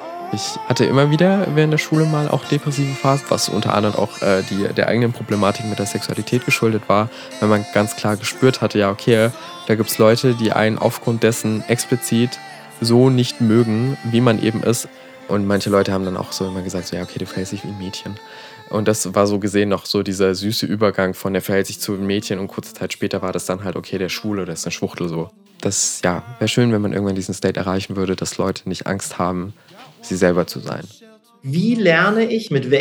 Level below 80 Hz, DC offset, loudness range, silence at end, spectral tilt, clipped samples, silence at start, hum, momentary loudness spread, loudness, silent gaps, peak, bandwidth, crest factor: -60 dBFS; under 0.1%; 6 LU; 0 s; -5 dB/octave; under 0.1%; 0 s; none; 11 LU; -19 LUFS; none; 0 dBFS; 20 kHz; 18 dB